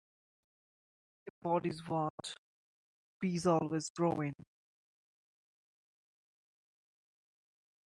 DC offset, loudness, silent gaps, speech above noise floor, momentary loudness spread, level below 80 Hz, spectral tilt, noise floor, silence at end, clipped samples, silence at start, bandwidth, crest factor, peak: under 0.1%; -36 LUFS; 1.30-1.42 s, 2.10-2.18 s, 2.38-3.20 s, 3.90-3.95 s; over 55 dB; 21 LU; -76 dBFS; -6 dB/octave; under -90 dBFS; 3.5 s; under 0.1%; 1.25 s; 11 kHz; 22 dB; -18 dBFS